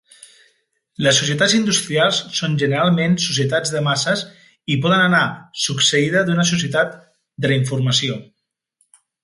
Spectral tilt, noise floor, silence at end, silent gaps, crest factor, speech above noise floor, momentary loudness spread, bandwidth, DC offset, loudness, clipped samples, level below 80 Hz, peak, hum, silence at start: -4 dB/octave; -67 dBFS; 1 s; none; 16 dB; 49 dB; 8 LU; 11.5 kHz; under 0.1%; -17 LUFS; under 0.1%; -58 dBFS; -2 dBFS; none; 1 s